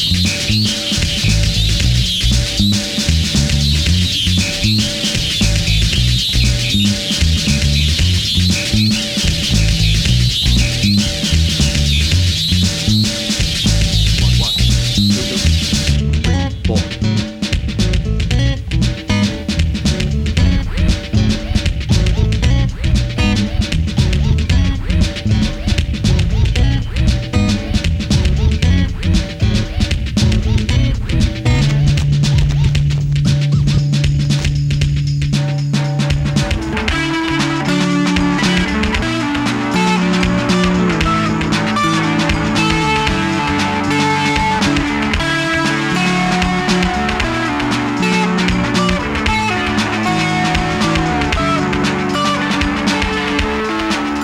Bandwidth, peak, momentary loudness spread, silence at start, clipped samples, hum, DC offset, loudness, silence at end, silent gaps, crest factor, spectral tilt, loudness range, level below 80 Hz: 17 kHz; 0 dBFS; 4 LU; 0 s; under 0.1%; none; under 0.1%; -15 LUFS; 0 s; none; 14 dB; -4.5 dB/octave; 3 LU; -20 dBFS